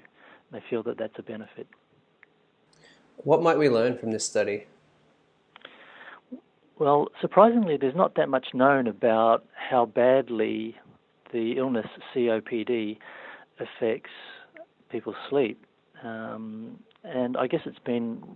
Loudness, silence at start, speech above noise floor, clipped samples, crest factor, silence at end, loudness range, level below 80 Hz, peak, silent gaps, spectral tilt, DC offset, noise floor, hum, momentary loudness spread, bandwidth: -26 LUFS; 0.5 s; 39 dB; under 0.1%; 24 dB; 0 s; 10 LU; -76 dBFS; -4 dBFS; none; -5.5 dB/octave; under 0.1%; -64 dBFS; none; 23 LU; 10 kHz